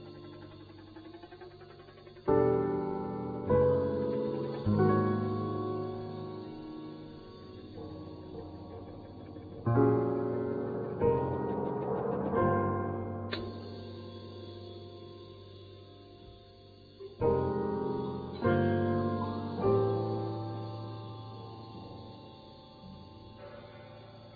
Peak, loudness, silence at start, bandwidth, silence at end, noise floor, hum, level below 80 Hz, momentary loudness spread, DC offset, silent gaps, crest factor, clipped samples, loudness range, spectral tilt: -14 dBFS; -32 LUFS; 0 s; 5 kHz; 0 s; -54 dBFS; none; -58 dBFS; 22 LU; under 0.1%; none; 20 dB; under 0.1%; 15 LU; -7.5 dB/octave